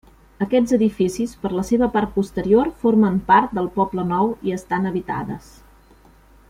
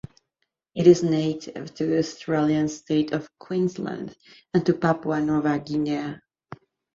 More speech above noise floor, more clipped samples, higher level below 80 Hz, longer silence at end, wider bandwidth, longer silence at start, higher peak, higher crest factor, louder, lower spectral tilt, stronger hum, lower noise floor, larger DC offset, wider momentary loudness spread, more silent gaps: second, 31 dB vs 55 dB; neither; first, -46 dBFS vs -60 dBFS; first, 1.1 s vs 0.75 s; first, 15 kHz vs 7.6 kHz; second, 0.4 s vs 0.75 s; about the same, -2 dBFS vs -4 dBFS; about the same, 18 dB vs 22 dB; first, -20 LUFS vs -24 LUFS; about the same, -7 dB/octave vs -6.5 dB/octave; neither; second, -50 dBFS vs -78 dBFS; neither; second, 10 LU vs 15 LU; neither